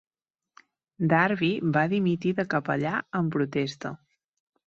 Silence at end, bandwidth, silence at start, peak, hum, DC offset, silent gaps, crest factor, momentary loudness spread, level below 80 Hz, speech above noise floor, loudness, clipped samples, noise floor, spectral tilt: 0.7 s; 7.4 kHz; 1 s; -6 dBFS; none; under 0.1%; none; 20 dB; 9 LU; -66 dBFS; 34 dB; -26 LUFS; under 0.1%; -60 dBFS; -7.5 dB/octave